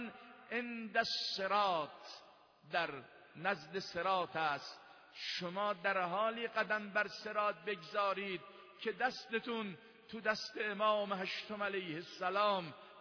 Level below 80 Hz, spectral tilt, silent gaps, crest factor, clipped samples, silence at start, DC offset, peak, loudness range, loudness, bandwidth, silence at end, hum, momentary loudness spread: -82 dBFS; -1 dB/octave; none; 20 dB; under 0.1%; 0 s; under 0.1%; -20 dBFS; 2 LU; -38 LUFS; 5.4 kHz; 0 s; none; 15 LU